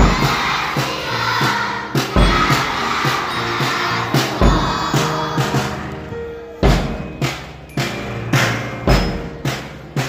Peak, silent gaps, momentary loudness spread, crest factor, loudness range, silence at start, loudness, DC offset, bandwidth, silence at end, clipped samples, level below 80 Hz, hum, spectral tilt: 0 dBFS; none; 10 LU; 18 dB; 4 LU; 0 s; -18 LUFS; under 0.1%; 16 kHz; 0 s; under 0.1%; -26 dBFS; none; -4.5 dB/octave